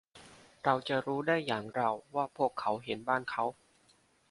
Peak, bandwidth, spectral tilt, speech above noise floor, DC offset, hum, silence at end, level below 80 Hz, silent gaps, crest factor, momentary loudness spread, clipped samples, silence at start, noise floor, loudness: -12 dBFS; 11.5 kHz; -6 dB/octave; 35 dB; under 0.1%; none; 0.8 s; -74 dBFS; none; 24 dB; 5 LU; under 0.1%; 0.15 s; -68 dBFS; -33 LUFS